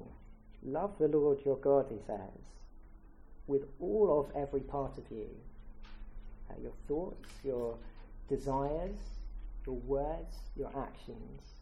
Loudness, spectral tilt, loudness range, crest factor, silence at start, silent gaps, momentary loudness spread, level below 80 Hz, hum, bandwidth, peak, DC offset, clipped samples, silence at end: -36 LUFS; -8.5 dB/octave; 8 LU; 20 dB; 0 s; none; 24 LU; -48 dBFS; none; 11 kHz; -18 dBFS; under 0.1%; under 0.1%; 0 s